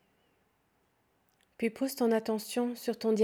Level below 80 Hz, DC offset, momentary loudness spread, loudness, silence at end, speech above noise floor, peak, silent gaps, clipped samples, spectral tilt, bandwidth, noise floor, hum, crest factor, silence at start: -80 dBFS; under 0.1%; 6 LU; -32 LUFS; 0 s; 43 dB; -16 dBFS; none; under 0.1%; -5 dB/octave; 19 kHz; -73 dBFS; none; 18 dB; 1.6 s